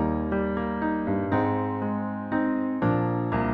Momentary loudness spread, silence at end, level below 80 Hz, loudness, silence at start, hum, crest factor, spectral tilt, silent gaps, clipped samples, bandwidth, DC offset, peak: 4 LU; 0 s; -44 dBFS; -27 LUFS; 0 s; none; 12 dB; -11 dB/octave; none; under 0.1%; 5 kHz; under 0.1%; -12 dBFS